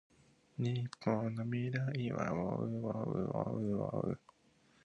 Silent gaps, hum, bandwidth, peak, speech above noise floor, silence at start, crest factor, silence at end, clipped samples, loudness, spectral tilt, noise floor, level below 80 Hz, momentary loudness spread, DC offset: none; none; 9.2 kHz; -18 dBFS; 33 dB; 0.6 s; 20 dB; 0.7 s; under 0.1%; -38 LUFS; -8.5 dB/octave; -70 dBFS; -66 dBFS; 3 LU; under 0.1%